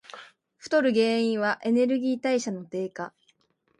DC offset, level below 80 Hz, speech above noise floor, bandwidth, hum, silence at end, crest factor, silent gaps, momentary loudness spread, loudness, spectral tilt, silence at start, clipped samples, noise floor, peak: under 0.1%; -76 dBFS; 43 dB; 11 kHz; none; 0.7 s; 16 dB; none; 17 LU; -25 LUFS; -5 dB/octave; 0.15 s; under 0.1%; -68 dBFS; -12 dBFS